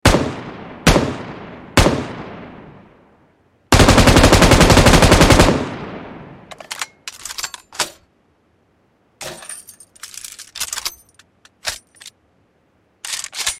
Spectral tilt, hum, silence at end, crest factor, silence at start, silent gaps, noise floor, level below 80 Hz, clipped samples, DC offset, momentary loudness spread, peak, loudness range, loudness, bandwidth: -4.5 dB/octave; none; 0.05 s; 18 dB; 0.05 s; none; -60 dBFS; -26 dBFS; under 0.1%; under 0.1%; 23 LU; 0 dBFS; 18 LU; -14 LUFS; 16.5 kHz